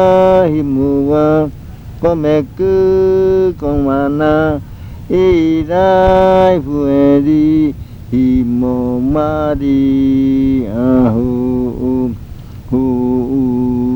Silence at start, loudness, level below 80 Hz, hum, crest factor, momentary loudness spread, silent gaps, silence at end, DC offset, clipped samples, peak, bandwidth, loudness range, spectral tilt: 0 s; -12 LUFS; -30 dBFS; none; 12 dB; 8 LU; none; 0 s; under 0.1%; 0.1%; 0 dBFS; 19 kHz; 3 LU; -9 dB/octave